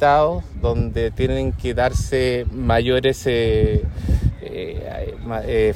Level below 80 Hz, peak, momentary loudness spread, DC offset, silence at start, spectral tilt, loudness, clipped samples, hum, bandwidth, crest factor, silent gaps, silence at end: -26 dBFS; -4 dBFS; 11 LU; under 0.1%; 0 s; -6.5 dB/octave; -21 LUFS; under 0.1%; none; 15 kHz; 16 dB; none; 0 s